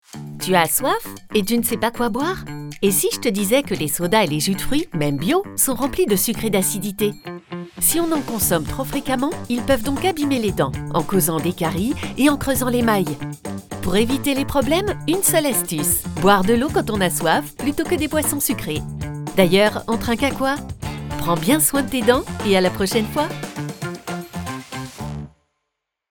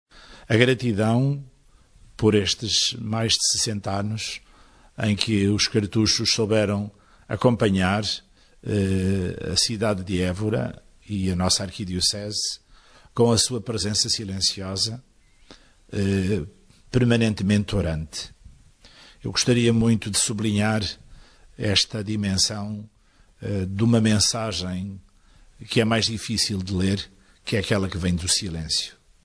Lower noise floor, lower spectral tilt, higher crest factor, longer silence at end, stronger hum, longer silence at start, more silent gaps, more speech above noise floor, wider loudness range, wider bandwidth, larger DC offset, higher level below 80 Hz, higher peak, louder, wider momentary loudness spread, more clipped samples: first, -79 dBFS vs -56 dBFS; about the same, -4 dB/octave vs -4 dB/octave; about the same, 20 dB vs 22 dB; first, 0.85 s vs 0.35 s; neither; about the same, 0.15 s vs 0.15 s; neither; first, 59 dB vs 34 dB; about the same, 3 LU vs 3 LU; first, over 20 kHz vs 11 kHz; neither; first, -40 dBFS vs -46 dBFS; about the same, 0 dBFS vs -2 dBFS; first, -20 LUFS vs -23 LUFS; about the same, 13 LU vs 13 LU; neither